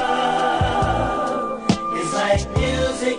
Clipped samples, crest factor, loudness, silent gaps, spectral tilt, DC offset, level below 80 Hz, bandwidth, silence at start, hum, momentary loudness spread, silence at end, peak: under 0.1%; 16 dB; -21 LUFS; none; -5 dB/octave; under 0.1%; -32 dBFS; 10.5 kHz; 0 s; none; 3 LU; 0 s; -4 dBFS